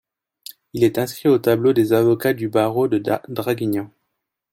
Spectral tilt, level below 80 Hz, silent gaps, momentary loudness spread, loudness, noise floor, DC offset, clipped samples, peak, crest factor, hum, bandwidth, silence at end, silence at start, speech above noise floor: -6.5 dB/octave; -58 dBFS; none; 18 LU; -19 LUFS; -77 dBFS; under 0.1%; under 0.1%; -4 dBFS; 16 dB; none; 17 kHz; 0.65 s; 0.75 s; 59 dB